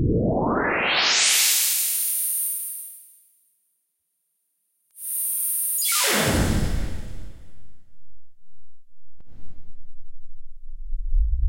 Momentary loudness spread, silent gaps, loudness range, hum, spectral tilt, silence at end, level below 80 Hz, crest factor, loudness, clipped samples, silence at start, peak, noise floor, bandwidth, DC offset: 18 LU; none; 12 LU; none; -2.5 dB/octave; 0 s; -32 dBFS; 18 dB; -20 LUFS; under 0.1%; 0 s; -6 dBFS; -75 dBFS; 16.5 kHz; under 0.1%